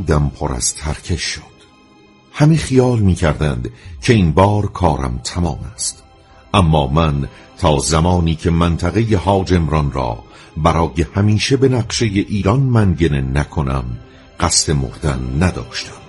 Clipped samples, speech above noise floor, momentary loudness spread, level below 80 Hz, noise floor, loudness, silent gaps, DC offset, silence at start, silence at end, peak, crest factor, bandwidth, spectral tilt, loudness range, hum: under 0.1%; 31 dB; 9 LU; -28 dBFS; -47 dBFS; -16 LUFS; none; under 0.1%; 0 s; 0 s; 0 dBFS; 16 dB; 11.5 kHz; -5.5 dB/octave; 2 LU; none